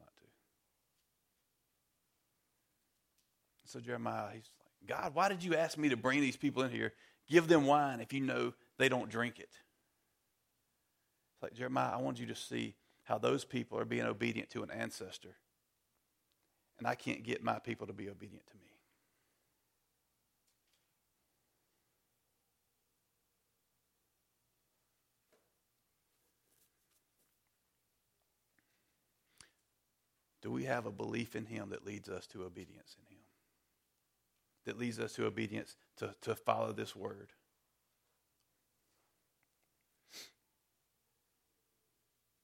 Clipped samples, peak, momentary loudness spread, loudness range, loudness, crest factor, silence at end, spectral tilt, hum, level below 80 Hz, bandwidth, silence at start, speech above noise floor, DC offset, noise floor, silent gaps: under 0.1%; -12 dBFS; 18 LU; 15 LU; -37 LUFS; 28 dB; 2.15 s; -5 dB/octave; 60 Hz at -70 dBFS; -80 dBFS; 16.5 kHz; 3.65 s; 45 dB; under 0.1%; -82 dBFS; none